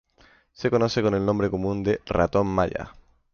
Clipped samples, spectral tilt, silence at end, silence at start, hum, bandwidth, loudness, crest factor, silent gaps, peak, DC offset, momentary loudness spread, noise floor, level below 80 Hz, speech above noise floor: under 0.1%; -7 dB/octave; 0.45 s; 0.6 s; none; 7 kHz; -24 LUFS; 18 dB; none; -8 dBFS; under 0.1%; 6 LU; -58 dBFS; -44 dBFS; 35 dB